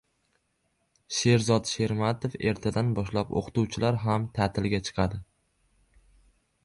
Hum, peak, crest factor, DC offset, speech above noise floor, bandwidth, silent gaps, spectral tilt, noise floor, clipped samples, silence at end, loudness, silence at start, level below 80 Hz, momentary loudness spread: none; -10 dBFS; 18 dB; under 0.1%; 47 dB; 11.5 kHz; none; -5.5 dB/octave; -74 dBFS; under 0.1%; 1.4 s; -27 LUFS; 1.1 s; -50 dBFS; 6 LU